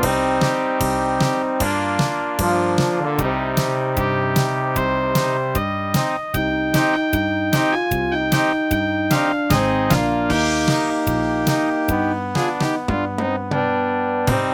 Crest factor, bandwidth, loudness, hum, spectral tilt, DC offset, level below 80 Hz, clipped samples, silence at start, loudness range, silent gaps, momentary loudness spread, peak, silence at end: 16 dB; 19 kHz; -20 LUFS; none; -5.5 dB/octave; under 0.1%; -36 dBFS; under 0.1%; 0 s; 2 LU; none; 3 LU; -4 dBFS; 0 s